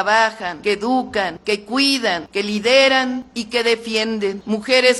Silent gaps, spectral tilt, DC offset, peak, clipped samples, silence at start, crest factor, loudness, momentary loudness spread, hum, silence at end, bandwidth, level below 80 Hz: none; -3 dB/octave; under 0.1%; 0 dBFS; under 0.1%; 0 s; 18 dB; -18 LUFS; 10 LU; none; 0 s; 12 kHz; -56 dBFS